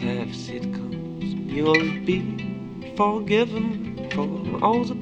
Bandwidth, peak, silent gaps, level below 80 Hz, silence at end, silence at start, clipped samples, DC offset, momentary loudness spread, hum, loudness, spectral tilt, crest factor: 8.4 kHz; -4 dBFS; none; -52 dBFS; 0 s; 0 s; under 0.1%; under 0.1%; 11 LU; none; -25 LUFS; -6.5 dB/octave; 22 dB